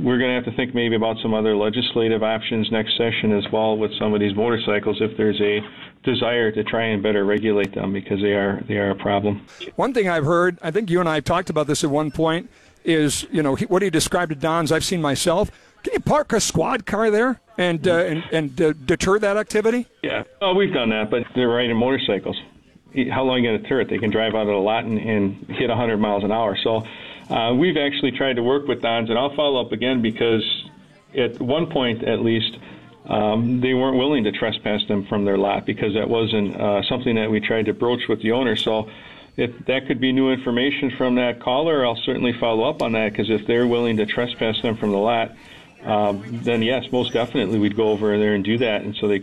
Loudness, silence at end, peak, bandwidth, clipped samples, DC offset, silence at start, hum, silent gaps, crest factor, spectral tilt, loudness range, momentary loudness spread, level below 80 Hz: -21 LUFS; 0 s; -8 dBFS; 14 kHz; under 0.1%; 0.3%; 0 s; none; none; 12 dB; -5 dB/octave; 1 LU; 5 LU; -50 dBFS